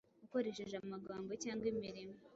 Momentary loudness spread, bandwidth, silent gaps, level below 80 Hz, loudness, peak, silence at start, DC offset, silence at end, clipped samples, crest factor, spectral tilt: 7 LU; 7.6 kHz; none; -74 dBFS; -44 LUFS; -28 dBFS; 0.2 s; under 0.1%; 0 s; under 0.1%; 16 dB; -5 dB/octave